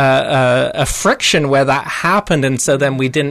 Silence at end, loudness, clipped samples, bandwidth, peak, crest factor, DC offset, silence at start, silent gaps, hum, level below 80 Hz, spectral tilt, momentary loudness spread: 0 s; -14 LUFS; under 0.1%; 13.5 kHz; -4 dBFS; 10 dB; under 0.1%; 0 s; none; none; -36 dBFS; -4 dB/octave; 3 LU